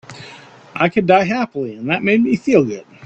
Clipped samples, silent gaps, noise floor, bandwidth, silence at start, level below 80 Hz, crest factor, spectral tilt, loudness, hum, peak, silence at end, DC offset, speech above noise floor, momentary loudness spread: under 0.1%; none; -40 dBFS; 8.2 kHz; 0.1 s; -56 dBFS; 16 dB; -6.5 dB/octave; -16 LUFS; none; 0 dBFS; 0 s; under 0.1%; 24 dB; 20 LU